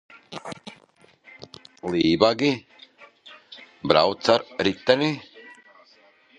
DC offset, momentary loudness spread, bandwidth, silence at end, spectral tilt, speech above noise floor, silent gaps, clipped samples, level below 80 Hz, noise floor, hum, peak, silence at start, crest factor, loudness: under 0.1%; 24 LU; 10.5 kHz; 0.9 s; -5 dB/octave; 35 dB; none; under 0.1%; -58 dBFS; -57 dBFS; none; 0 dBFS; 0.3 s; 24 dB; -22 LUFS